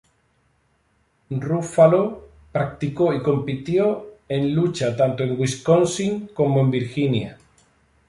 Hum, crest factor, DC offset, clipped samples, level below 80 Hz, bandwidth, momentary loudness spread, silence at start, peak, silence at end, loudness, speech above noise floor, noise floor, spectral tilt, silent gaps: none; 20 dB; under 0.1%; under 0.1%; -54 dBFS; 11.5 kHz; 11 LU; 1.3 s; -2 dBFS; 0.75 s; -21 LUFS; 45 dB; -65 dBFS; -6.5 dB/octave; none